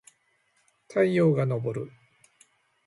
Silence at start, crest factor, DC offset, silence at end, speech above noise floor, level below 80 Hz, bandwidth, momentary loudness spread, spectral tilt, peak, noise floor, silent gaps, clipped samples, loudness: 0.9 s; 18 dB; under 0.1%; 1 s; 45 dB; -70 dBFS; 11.5 kHz; 14 LU; -8.5 dB/octave; -12 dBFS; -69 dBFS; none; under 0.1%; -26 LUFS